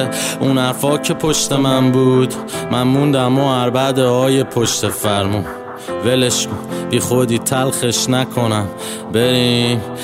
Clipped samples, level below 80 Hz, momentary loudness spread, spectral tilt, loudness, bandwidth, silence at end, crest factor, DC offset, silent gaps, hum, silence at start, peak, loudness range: under 0.1%; -48 dBFS; 7 LU; -4.5 dB/octave; -15 LUFS; 16.5 kHz; 0 s; 14 dB; under 0.1%; none; none; 0 s; -2 dBFS; 2 LU